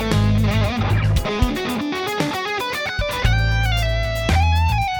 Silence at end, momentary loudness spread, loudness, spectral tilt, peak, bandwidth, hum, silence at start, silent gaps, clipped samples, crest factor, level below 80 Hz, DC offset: 0 s; 5 LU; -20 LUFS; -5.5 dB/octave; -4 dBFS; 18 kHz; none; 0 s; none; under 0.1%; 16 dB; -26 dBFS; under 0.1%